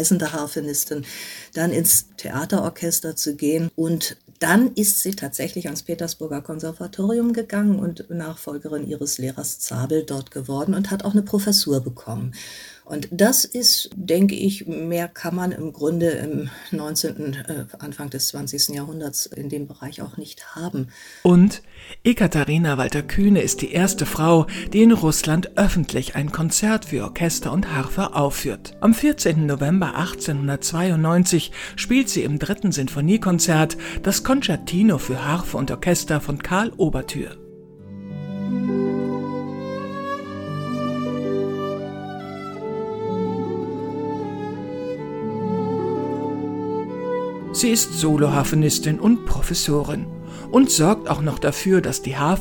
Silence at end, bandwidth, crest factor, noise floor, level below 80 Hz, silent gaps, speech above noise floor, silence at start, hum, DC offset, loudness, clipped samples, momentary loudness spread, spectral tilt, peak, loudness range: 0 s; 17.5 kHz; 20 dB; -42 dBFS; -40 dBFS; none; 21 dB; 0 s; none; under 0.1%; -21 LUFS; under 0.1%; 13 LU; -4.5 dB/octave; -2 dBFS; 8 LU